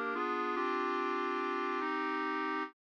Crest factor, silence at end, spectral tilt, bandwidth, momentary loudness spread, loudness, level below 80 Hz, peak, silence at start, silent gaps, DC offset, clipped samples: 12 dB; 0.2 s; -3.5 dB/octave; 8.2 kHz; 1 LU; -35 LUFS; -88 dBFS; -24 dBFS; 0 s; none; under 0.1%; under 0.1%